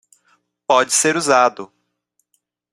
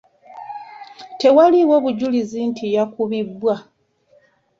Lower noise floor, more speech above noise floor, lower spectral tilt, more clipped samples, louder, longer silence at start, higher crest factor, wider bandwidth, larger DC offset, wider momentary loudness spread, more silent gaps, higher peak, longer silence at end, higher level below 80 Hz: first, -70 dBFS vs -57 dBFS; first, 54 dB vs 41 dB; second, -2 dB/octave vs -6.5 dB/octave; neither; about the same, -15 LUFS vs -17 LUFS; first, 0.7 s vs 0.3 s; about the same, 18 dB vs 16 dB; first, 15.5 kHz vs 7.6 kHz; neither; second, 21 LU vs 24 LU; neither; about the same, -2 dBFS vs -2 dBFS; about the same, 1.1 s vs 1 s; about the same, -66 dBFS vs -64 dBFS